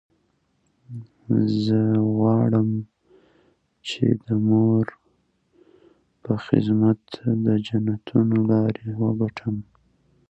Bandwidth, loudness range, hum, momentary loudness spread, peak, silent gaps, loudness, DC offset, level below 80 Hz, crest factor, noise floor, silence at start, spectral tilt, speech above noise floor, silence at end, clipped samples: 8 kHz; 3 LU; none; 13 LU; -2 dBFS; none; -22 LUFS; under 0.1%; -58 dBFS; 20 dB; -68 dBFS; 0.9 s; -9 dB/octave; 47 dB; 0.65 s; under 0.1%